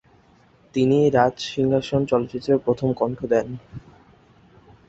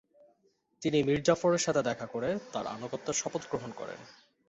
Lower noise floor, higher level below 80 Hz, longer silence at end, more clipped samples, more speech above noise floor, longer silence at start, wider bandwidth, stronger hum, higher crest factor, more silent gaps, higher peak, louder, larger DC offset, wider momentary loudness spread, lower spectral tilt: second, -55 dBFS vs -72 dBFS; first, -54 dBFS vs -64 dBFS; first, 1.1 s vs 0.35 s; neither; second, 35 dB vs 41 dB; about the same, 0.75 s vs 0.8 s; about the same, 8 kHz vs 8.4 kHz; neither; about the same, 20 dB vs 22 dB; neither; first, -4 dBFS vs -10 dBFS; first, -21 LUFS vs -31 LUFS; neither; about the same, 15 LU vs 13 LU; first, -7 dB/octave vs -4.5 dB/octave